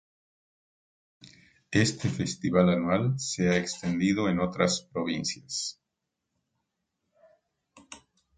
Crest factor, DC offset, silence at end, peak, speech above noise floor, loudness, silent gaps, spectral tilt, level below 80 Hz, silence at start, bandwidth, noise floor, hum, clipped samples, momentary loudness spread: 22 dB; under 0.1%; 0.4 s; -8 dBFS; 57 dB; -28 LUFS; none; -5 dB/octave; -58 dBFS; 1.25 s; 9.4 kHz; -84 dBFS; none; under 0.1%; 9 LU